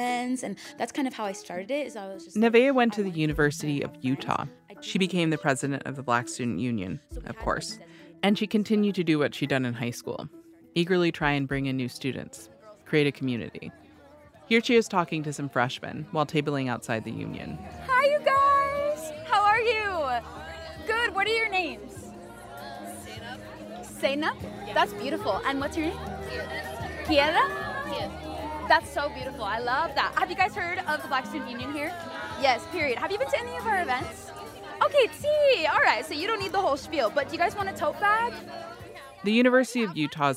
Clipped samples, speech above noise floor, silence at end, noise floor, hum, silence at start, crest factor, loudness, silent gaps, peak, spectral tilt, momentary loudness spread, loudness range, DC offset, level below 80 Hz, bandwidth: under 0.1%; 26 dB; 0 s; -52 dBFS; none; 0 s; 20 dB; -27 LUFS; none; -6 dBFS; -5 dB/octave; 17 LU; 5 LU; under 0.1%; -52 dBFS; 16 kHz